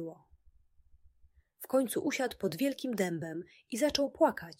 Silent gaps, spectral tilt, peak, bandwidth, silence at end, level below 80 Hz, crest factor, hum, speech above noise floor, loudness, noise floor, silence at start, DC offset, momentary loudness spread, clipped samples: none; -4.5 dB/octave; -14 dBFS; 16.5 kHz; 0.05 s; -66 dBFS; 22 dB; none; 33 dB; -33 LUFS; -65 dBFS; 0 s; under 0.1%; 12 LU; under 0.1%